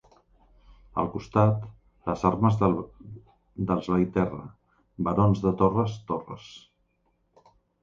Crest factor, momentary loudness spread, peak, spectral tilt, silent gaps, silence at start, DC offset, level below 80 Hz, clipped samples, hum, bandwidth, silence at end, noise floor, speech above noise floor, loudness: 22 dB; 21 LU; -6 dBFS; -9 dB/octave; none; 0.95 s; under 0.1%; -50 dBFS; under 0.1%; none; 7.2 kHz; 1.25 s; -71 dBFS; 46 dB; -26 LUFS